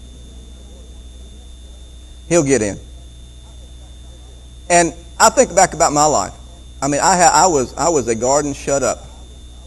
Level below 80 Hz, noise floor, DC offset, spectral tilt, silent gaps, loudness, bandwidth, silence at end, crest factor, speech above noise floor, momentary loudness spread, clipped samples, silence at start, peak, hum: -36 dBFS; -37 dBFS; under 0.1%; -3 dB/octave; none; -15 LUFS; over 20 kHz; 0 s; 18 dB; 23 dB; 10 LU; under 0.1%; 0 s; 0 dBFS; none